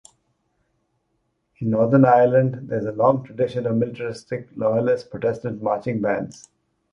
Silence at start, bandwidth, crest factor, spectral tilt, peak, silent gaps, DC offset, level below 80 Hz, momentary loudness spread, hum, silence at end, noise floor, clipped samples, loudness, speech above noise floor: 1.6 s; 10.5 kHz; 20 dB; -8.5 dB/octave; -2 dBFS; none; under 0.1%; -60 dBFS; 14 LU; none; 0.6 s; -71 dBFS; under 0.1%; -21 LUFS; 51 dB